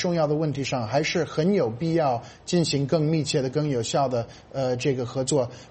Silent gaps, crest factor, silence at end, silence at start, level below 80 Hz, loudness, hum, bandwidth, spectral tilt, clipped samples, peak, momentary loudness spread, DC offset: none; 14 dB; 0.05 s; 0 s; -56 dBFS; -25 LUFS; none; 8.8 kHz; -5.5 dB/octave; under 0.1%; -10 dBFS; 4 LU; under 0.1%